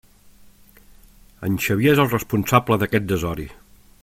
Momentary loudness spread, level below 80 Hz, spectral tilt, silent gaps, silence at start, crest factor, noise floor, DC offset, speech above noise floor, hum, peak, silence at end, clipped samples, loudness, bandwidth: 13 LU; -46 dBFS; -6 dB/octave; none; 1.4 s; 22 dB; -49 dBFS; under 0.1%; 30 dB; none; 0 dBFS; 0.5 s; under 0.1%; -20 LUFS; 16.5 kHz